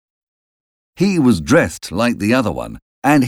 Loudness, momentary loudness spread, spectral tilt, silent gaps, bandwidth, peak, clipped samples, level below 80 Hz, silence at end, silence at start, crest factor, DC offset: -16 LUFS; 9 LU; -6 dB/octave; 2.82-3.02 s; 16 kHz; 0 dBFS; under 0.1%; -42 dBFS; 0 s; 1 s; 16 dB; under 0.1%